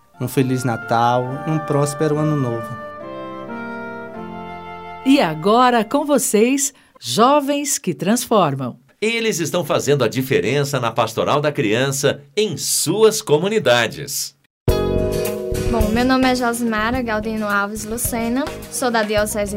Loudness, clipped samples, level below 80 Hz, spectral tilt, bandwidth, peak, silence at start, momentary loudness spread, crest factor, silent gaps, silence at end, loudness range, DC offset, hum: -18 LUFS; under 0.1%; -38 dBFS; -4.5 dB/octave; 16.5 kHz; 0 dBFS; 0.2 s; 14 LU; 18 dB; 14.46-14.66 s; 0 s; 5 LU; under 0.1%; none